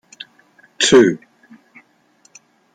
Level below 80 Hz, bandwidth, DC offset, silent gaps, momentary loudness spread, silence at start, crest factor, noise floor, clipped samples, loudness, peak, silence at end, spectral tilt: -58 dBFS; 9.6 kHz; under 0.1%; none; 26 LU; 0.8 s; 18 dB; -56 dBFS; under 0.1%; -13 LUFS; -2 dBFS; 1.6 s; -3.5 dB/octave